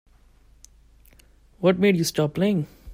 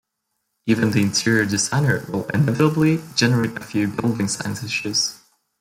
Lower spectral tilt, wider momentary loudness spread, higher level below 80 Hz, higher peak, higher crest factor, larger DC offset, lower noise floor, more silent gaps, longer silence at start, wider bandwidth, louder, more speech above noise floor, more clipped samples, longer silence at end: first, -6 dB/octave vs -4.5 dB/octave; about the same, 4 LU vs 6 LU; about the same, -54 dBFS vs -56 dBFS; about the same, -6 dBFS vs -4 dBFS; about the same, 18 dB vs 16 dB; neither; second, -55 dBFS vs -76 dBFS; neither; first, 1.6 s vs 0.65 s; about the same, 16 kHz vs 16.5 kHz; about the same, -22 LUFS vs -20 LUFS; second, 34 dB vs 56 dB; neither; second, 0 s vs 0.45 s